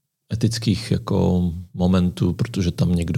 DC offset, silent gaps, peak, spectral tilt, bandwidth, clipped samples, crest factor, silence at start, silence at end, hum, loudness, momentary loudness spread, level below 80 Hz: under 0.1%; none; -6 dBFS; -7 dB/octave; 14 kHz; under 0.1%; 16 dB; 0.3 s; 0 s; none; -21 LUFS; 5 LU; -40 dBFS